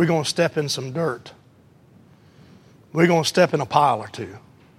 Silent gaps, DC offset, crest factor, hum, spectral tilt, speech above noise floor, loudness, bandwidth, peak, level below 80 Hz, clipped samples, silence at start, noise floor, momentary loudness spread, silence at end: none; under 0.1%; 20 dB; none; -5 dB/octave; 32 dB; -21 LUFS; 15 kHz; -2 dBFS; -64 dBFS; under 0.1%; 0 s; -53 dBFS; 16 LU; 0.4 s